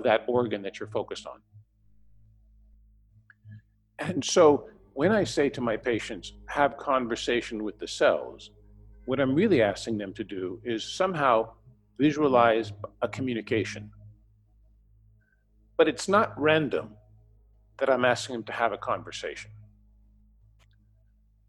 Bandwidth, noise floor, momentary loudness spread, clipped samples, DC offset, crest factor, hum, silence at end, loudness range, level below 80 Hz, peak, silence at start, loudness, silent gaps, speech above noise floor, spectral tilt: 12 kHz; -64 dBFS; 15 LU; under 0.1%; under 0.1%; 22 dB; none; 1.85 s; 8 LU; -58 dBFS; -6 dBFS; 0 s; -27 LUFS; none; 37 dB; -5 dB/octave